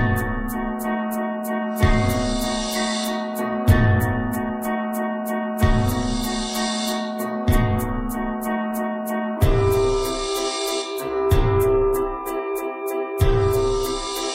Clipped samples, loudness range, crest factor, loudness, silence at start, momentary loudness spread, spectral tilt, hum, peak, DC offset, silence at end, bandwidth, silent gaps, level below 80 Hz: under 0.1%; 2 LU; 18 dB; -22 LUFS; 0 s; 7 LU; -5.5 dB/octave; none; -2 dBFS; under 0.1%; 0 s; 16 kHz; none; -28 dBFS